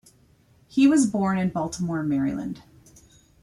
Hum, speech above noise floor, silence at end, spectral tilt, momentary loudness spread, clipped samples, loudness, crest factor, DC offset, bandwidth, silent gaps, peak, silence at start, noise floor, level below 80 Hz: none; 36 dB; 0.85 s; -6 dB/octave; 14 LU; under 0.1%; -23 LUFS; 16 dB; under 0.1%; 12 kHz; none; -8 dBFS; 0.75 s; -58 dBFS; -56 dBFS